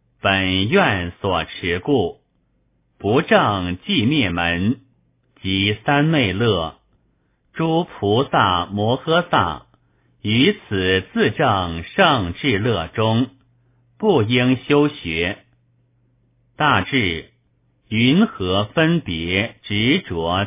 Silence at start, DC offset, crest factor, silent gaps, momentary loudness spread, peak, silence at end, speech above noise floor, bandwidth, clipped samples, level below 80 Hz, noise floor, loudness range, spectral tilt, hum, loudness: 0.25 s; under 0.1%; 18 dB; none; 8 LU; -2 dBFS; 0 s; 46 dB; 3.9 kHz; under 0.1%; -42 dBFS; -64 dBFS; 2 LU; -10 dB/octave; none; -19 LUFS